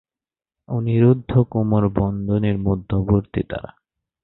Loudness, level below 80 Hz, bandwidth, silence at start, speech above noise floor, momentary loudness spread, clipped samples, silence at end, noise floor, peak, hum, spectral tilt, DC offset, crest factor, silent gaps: -20 LUFS; -38 dBFS; 4.1 kHz; 0.7 s; over 71 dB; 10 LU; under 0.1%; 0.55 s; under -90 dBFS; -2 dBFS; none; -13.5 dB/octave; under 0.1%; 18 dB; none